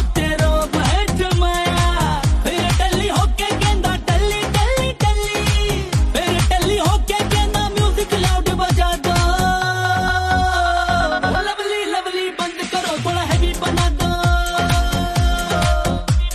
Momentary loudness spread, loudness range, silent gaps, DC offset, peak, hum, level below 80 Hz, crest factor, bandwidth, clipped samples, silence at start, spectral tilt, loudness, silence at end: 3 LU; 2 LU; none; under 0.1%; -4 dBFS; none; -22 dBFS; 12 dB; 13.5 kHz; under 0.1%; 0 s; -4.5 dB/octave; -18 LUFS; 0 s